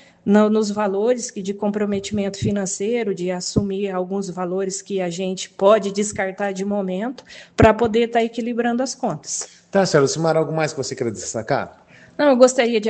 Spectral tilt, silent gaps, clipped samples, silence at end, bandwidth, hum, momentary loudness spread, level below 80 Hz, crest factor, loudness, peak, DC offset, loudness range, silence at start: -5 dB/octave; none; under 0.1%; 0 s; 9.2 kHz; none; 10 LU; -46 dBFS; 20 dB; -20 LUFS; 0 dBFS; under 0.1%; 4 LU; 0.25 s